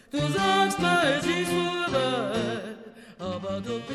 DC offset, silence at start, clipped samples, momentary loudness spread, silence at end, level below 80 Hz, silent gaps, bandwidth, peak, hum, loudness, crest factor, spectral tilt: under 0.1%; 0.15 s; under 0.1%; 13 LU; 0 s; -56 dBFS; none; 14 kHz; -10 dBFS; none; -26 LUFS; 16 dB; -4.5 dB/octave